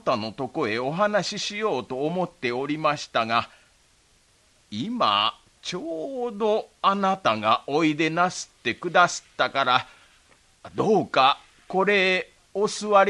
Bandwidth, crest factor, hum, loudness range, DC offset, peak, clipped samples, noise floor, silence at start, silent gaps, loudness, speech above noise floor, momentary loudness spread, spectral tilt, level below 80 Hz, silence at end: 11.5 kHz; 22 dB; none; 4 LU; under 0.1%; -4 dBFS; under 0.1%; -61 dBFS; 0.05 s; none; -24 LUFS; 37 dB; 11 LU; -4 dB/octave; -64 dBFS; 0 s